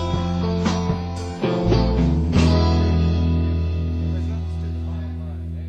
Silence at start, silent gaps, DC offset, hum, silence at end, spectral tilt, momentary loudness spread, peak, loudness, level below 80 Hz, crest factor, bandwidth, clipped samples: 0 s; none; under 0.1%; none; 0 s; -7.5 dB/octave; 10 LU; -4 dBFS; -21 LUFS; -24 dBFS; 16 dB; 8.6 kHz; under 0.1%